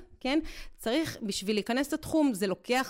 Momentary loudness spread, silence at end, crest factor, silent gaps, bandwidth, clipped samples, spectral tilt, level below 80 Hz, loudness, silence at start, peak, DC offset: 6 LU; 0 s; 14 dB; none; 16 kHz; under 0.1%; -4 dB/octave; -52 dBFS; -30 LUFS; 0 s; -18 dBFS; under 0.1%